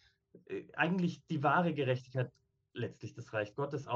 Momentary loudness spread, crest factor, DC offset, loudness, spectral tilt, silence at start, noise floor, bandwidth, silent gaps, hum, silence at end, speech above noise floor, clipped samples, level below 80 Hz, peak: 14 LU; 20 dB; under 0.1%; -36 LUFS; -7.5 dB/octave; 0.35 s; -63 dBFS; 7.4 kHz; none; none; 0 s; 27 dB; under 0.1%; -76 dBFS; -16 dBFS